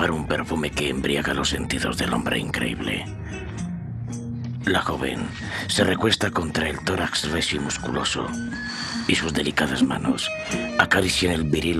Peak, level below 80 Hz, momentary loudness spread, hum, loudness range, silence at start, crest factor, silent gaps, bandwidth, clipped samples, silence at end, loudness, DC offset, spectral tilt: -4 dBFS; -42 dBFS; 11 LU; none; 4 LU; 0 s; 22 dB; none; 14.5 kHz; under 0.1%; 0 s; -24 LUFS; under 0.1%; -4 dB/octave